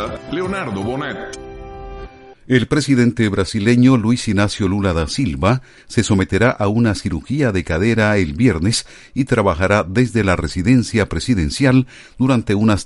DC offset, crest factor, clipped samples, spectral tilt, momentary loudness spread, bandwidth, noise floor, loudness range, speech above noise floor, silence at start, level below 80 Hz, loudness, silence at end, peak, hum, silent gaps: under 0.1%; 16 dB; under 0.1%; -6 dB/octave; 10 LU; 11.5 kHz; -36 dBFS; 2 LU; 20 dB; 0 s; -36 dBFS; -17 LUFS; 0 s; 0 dBFS; none; none